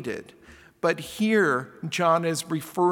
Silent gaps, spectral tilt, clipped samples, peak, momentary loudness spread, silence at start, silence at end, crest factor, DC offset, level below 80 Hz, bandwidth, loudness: none; -5 dB/octave; under 0.1%; -8 dBFS; 9 LU; 0 s; 0 s; 18 dB; under 0.1%; -64 dBFS; 18 kHz; -25 LUFS